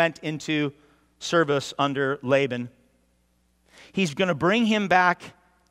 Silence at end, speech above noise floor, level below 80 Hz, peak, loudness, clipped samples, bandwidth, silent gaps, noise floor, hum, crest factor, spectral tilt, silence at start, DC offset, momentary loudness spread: 0.4 s; 43 dB; -66 dBFS; -4 dBFS; -24 LUFS; under 0.1%; 14.5 kHz; none; -66 dBFS; none; 20 dB; -5 dB/octave; 0 s; under 0.1%; 12 LU